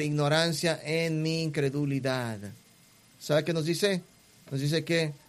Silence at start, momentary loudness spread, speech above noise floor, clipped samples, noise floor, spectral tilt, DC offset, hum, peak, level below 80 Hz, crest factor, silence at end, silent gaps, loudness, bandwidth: 0 s; 11 LU; 30 dB; under 0.1%; -59 dBFS; -5 dB/octave; under 0.1%; none; -10 dBFS; -66 dBFS; 18 dB; 0.1 s; none; -29 LUFS; 15 kHz